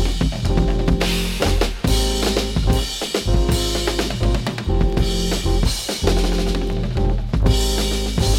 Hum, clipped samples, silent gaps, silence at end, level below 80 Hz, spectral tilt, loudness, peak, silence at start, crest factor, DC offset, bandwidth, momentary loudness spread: none; under 0.1%; none; 0 s; -20 dBFS; -5 dB/octave; -20 LUFS; -4 dBFS; 0 s; 14 dB; under 0.1%; 16.5 kHz; 3 LU